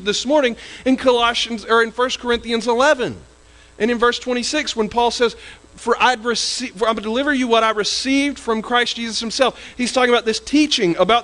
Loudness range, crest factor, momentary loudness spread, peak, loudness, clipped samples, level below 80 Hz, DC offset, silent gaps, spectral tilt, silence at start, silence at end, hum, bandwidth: 2 LU; 16 dB; 6 LU; -2 dBFS; -18 LUFS; under 0.1%; -48 dBFS; under 0.1%; none; -2.5 dB/octave; 0 s; 0 s; none; 11.5 kHz